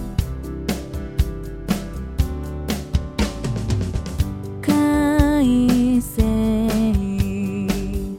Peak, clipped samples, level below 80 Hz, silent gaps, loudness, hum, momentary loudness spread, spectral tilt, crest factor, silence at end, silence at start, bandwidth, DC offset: -2 dBFS; under 0.1%; -28 dBFS; none; -21 LUFS; none; 10 LU; -6.5 dB/octave; 18 dB; 0 s; 0 s; 17 kHz; 0.2%